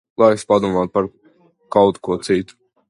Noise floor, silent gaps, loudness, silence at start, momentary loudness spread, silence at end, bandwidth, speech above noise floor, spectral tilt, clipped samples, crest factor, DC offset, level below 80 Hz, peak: -51 dBFS; none; -18 LUFS; 0.2 s; 8 LU; 0.45 s; 11.5 kHz; 35 dB; -6 dB/octave; under 0.1%; 18 dB; under 0.1%; -52 dBFS; 0 dBFS